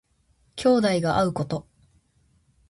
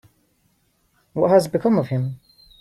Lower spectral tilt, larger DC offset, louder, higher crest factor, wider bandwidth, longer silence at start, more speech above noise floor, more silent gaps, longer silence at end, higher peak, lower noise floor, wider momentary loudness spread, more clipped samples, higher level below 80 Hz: second, -6 dB/octave vs -7.5 dB/octave; neither; second, -23 LUFS vs -20 LUFS; about the same, 16 dB vs 18 dB; second, 11.5 kHz vs 15 kHz; second, 0.55 s vs 1.15 s; about the same, 43 dB vs 46 dB; neither; first, 1.1 s vs 0.45 s; second, -10 dBFS vs -4 dBFS; about the same, -65 dBFS vs -65 dBFS; second, 12 LU vs 15 LU; neither; about the same, -54 dBFS vs -58 dBFS